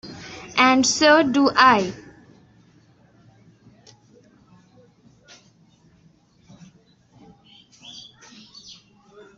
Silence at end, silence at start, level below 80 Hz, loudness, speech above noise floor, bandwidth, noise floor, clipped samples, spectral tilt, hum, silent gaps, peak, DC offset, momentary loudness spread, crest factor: 1.35 s; 0.05 s; -62 dBFS; -17 LUFS; 40 dB; 8.2 kHz; -57 dBFS; under 0.1%; -2.5 dB/octave; none; none; -2 dBFS; under 0.1%; 27 LU; 22 dB